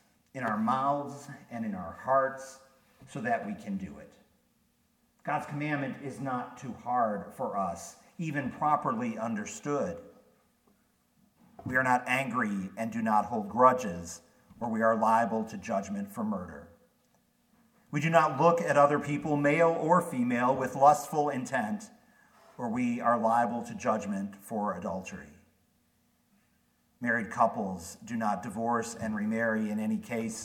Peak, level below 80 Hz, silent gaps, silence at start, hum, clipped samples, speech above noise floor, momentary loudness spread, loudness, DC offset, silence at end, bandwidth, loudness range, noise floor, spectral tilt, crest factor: -8 dBFS; -68 dBFS; none; 0.35 s; none; under 0.1%; 41 dB; 15 LU; -30 LUFS; under 0.1%; 0 s; 17 kHz; 10 LU; -71 dBFS; -6 dB/octave; 22 dB